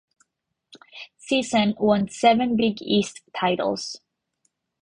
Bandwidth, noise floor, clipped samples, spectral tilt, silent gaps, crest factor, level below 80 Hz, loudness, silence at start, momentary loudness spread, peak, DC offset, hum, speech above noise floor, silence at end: 10.5 kHz; -78 dBFS; under 0.1%; -5 dB/octave; none; 22 dB; -60 dBFS; -22 LUFS; 0.75 s; 21 LU; -4 dBFS; under 0.1%; none; 57 dB; 0.85 s